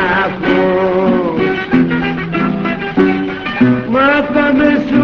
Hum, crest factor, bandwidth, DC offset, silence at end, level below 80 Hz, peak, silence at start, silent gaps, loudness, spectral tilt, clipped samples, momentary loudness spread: none; 12 dB; 6.2 kHz; under 0.1%; 0 s; -40 dBFS; 0 dBFS; 0 s; none; -13 LUFS; -8 dB/octave; under 0.1%; 5 LU